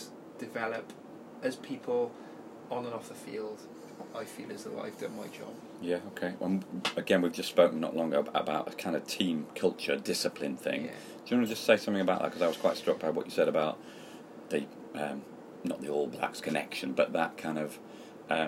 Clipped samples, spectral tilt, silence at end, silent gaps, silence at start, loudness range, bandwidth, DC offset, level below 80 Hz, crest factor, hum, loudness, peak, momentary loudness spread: under 0.1%; -4.5 dB/octave; 0 s; none; 0 s; 9 LU; 16 kHz; under 0.1%; -78 dBFS; 26 dB; none; -33 LUFS; -8 dBFS; 17 LU